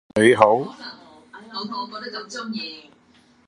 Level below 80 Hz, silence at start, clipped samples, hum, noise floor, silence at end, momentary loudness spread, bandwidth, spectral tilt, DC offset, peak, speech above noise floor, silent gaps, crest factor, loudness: -60 dBFS; 0.15 s; under 0.1%; none; -56 dBFS; 0.65 s; 21 LU; 11.5 kHz; -5 dB/octave; under 0.1%; 0 dBFS; 35 dB; none; 22 dB; -21 LUFS